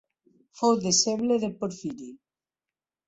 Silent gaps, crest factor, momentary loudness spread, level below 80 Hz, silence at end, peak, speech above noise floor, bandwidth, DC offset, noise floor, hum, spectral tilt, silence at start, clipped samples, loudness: none; 18 dB; 17 LU; -68 dBFS; 0.9 s; -10 dBFS; over 64 dB; 8.2 kHz; under 0.1%; under -90 dBFS; none; -3.5 dB/octave; 0.55 s; under 0.1%; -25 LUFS